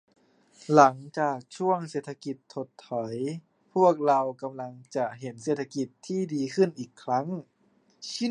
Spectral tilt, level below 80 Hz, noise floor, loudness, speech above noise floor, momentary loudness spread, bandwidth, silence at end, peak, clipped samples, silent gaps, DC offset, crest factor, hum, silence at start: -6 dB/octave; -80 dBFS; -66 dBFS; -28 LUFS; 39 dB; 17 LU; 10.5 kHz; 0 s; -4 dBFS; under 0.1%; none; under 0.1%; 24 dB; none; 0.7 s